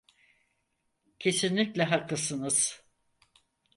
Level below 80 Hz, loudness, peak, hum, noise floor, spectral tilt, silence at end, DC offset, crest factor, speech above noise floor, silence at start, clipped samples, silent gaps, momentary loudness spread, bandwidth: -72 dBFS; -28 LUFS; -12 dBFS; none; -78 dBFS; -3 dB/octave; 1 s; under 0.1%; 20 dB; 49 dB; 1.2 s; under 0.1%; none; 5 LU; 11.5 kHz